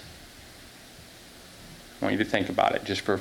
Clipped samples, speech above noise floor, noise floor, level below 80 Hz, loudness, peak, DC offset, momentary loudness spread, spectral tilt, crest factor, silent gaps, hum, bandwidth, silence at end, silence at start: under 0.1%; 22 dB; -48 dBFS; -58 dBFS; -27 LUFS; -8 dBFS; under 0.1%; 22 LU; -5 dB/octave; 22 dB; none; none; 18.5 kHz; 0 s; 0 s